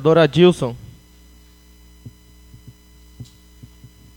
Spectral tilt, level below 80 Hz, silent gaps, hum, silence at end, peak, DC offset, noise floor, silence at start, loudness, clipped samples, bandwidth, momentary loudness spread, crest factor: -7 dB/octave; -48 dBFS; none; 60 Hz at -50 dBFS; 0.95 s; 0 dBFS; under 0.1%; -48 dBFS; 0 s; -15 LUFS; under 0.1%; 17.5 kHz; 29 LU; 22 dB